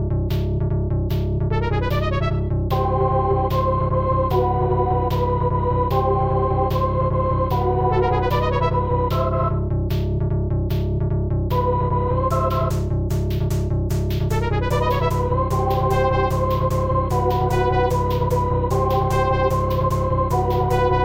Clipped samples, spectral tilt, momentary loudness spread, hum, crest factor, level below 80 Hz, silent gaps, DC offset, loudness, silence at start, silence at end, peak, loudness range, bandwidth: under 0.1%; -8 dB/octave; 3 LU; none; 12 dB; -28 dBFS; none; under 0.1%; -21 LUFS; 0 s; 0 s; -6 dBFS; 2 LU; 16.5 kHz